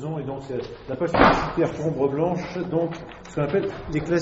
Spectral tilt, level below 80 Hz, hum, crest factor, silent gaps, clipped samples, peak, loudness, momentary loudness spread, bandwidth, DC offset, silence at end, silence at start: -5.5 dB/octave; -42 dBFS; none; 24 dB; none; under 0.1%; 0 dBFS; -24 LUFS; 14 LU; 8 kHz; under 0.1%; 0 s; 0 s